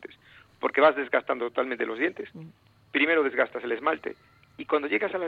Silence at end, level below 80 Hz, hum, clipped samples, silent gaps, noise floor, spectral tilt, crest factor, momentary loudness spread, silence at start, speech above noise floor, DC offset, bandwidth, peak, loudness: 0 s; -72 dBFS; none; under 0.1%; none; -55 dBFS; -6.5 dB/octave; 20 dB; 19 LU; 0 s; 29 dB; under 0.1%; 5 kHz; -8 dBFS; -26 LUFS